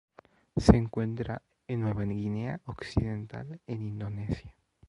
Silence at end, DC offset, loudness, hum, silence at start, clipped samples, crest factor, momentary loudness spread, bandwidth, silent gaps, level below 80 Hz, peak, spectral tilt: 0.4 s; under 0.1%; -31 LUFS; none; 0.55 s; under 0.1%; 28 dB; 16 LU; 11.5 kHz; none; -42 dBFS; -2 dBFS; -8 dB/octave